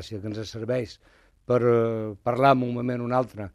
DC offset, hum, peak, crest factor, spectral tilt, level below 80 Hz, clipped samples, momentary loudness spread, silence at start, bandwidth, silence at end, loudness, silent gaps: under 0.1%; none; -4 dBFS; 20 dB; -7.5 dB/octave; -58 dBFS; under 0.1%; 13 LU; 0 s; 13 kHz; 0.05 s; -25 LUFS; none